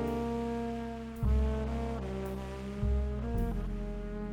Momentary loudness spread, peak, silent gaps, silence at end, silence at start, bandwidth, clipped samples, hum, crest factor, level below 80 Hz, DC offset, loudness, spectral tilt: 8 LU; -18 dBFS; none; 0 s; 0 s; 16 kHz; under 0.1%; none; 14 dB; -36 dBFS; under 0.1%; -35 LUFS; -8 dB/octave